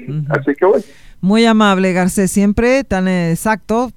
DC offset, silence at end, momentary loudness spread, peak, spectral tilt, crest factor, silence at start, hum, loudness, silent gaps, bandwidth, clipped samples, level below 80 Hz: 0.8%; 0.05 s; 7 LU; 0 dBFS; -5.5 dB/octave; 14 dB; 0 s; none; -14 LUFS; none; 15 kHz; under 0.1%; -38 dBFS